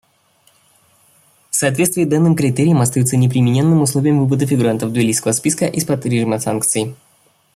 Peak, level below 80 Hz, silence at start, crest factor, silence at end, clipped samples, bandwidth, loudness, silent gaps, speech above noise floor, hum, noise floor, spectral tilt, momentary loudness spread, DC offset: -2 dBFS; -54 dBFS; 1.55 s; 14 dB; 0.6 s; under 0.1%; 15.5 kHz; -15 LUFS; none; 42 dB; none; -56 dBFS; -5.5 dB/octave; 4 LU; under 0.1%